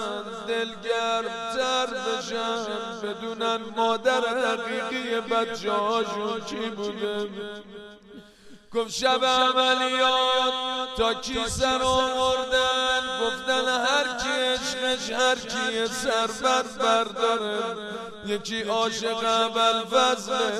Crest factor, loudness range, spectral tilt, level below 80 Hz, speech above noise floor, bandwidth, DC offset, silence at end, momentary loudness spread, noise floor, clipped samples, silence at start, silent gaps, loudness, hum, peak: 18 dB; 5 LU; -2 dB/octave; -52 dBFS; 24 dB; 14.5 kHz; under 0.1%; 0 s; 10 LU; -49 dBFS; under 0.1%; 0 s; none; -25 LUFS; none; -6 dBFS